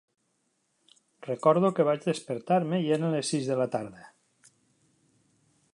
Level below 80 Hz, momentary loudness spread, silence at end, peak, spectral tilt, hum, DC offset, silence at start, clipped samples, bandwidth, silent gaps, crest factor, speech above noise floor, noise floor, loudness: -76 dBFS; 12 LU; 1.7 s; -8 dBFS; -6 dB/octave; none; under 0.1%; 1.2 s; under 0.1%; 11 kHz; none; 20 dB; 48 dB; -75 dBFS; -27 LUFS